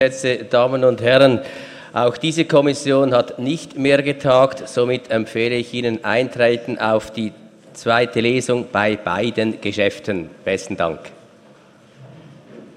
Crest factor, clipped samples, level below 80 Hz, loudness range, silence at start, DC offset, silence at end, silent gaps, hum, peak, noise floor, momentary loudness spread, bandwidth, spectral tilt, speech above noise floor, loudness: 18 dB; under 0.1%; -56 dBFS; 5 LU; 0 s; under 0.1%; 0.1 s; none; none; 0 dBFS; -48 dBFS; 9 LU; 11.5 kHz; -5 dB/octave; 30 dB; -18 LUFS